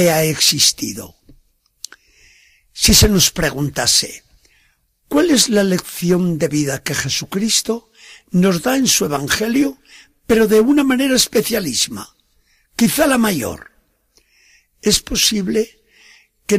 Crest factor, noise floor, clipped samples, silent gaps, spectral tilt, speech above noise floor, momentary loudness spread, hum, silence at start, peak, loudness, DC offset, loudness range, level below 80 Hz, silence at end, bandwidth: 18 dB; -60 dBFS; under 0.1%; none; -3 dB/octave; 44 dB; 14 LU; none; 0 s; 0 dBFS; -15 LUFS; under 0.1%; 4 LU; -36 dBFS; 0 s; 15.5 kHz